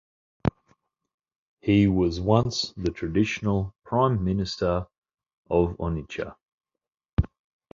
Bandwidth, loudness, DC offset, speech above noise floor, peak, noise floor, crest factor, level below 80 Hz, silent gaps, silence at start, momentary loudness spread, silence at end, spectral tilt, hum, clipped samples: 7.6 kHz; -26 LUFS; under 0.1%; 65 dB; -4 dBFS; -89 dBFS; 22 dB; -40 dBFS; 1.14-1.18 s, 1.38-1.57 s, 4.98-5.02 s, 5.38-5.43 s, 6.52-6.58 s, 7.13-7.17 s; 0.45 s; 10 LU; 0.45 s; -7 dB/octave; none; under 0.1%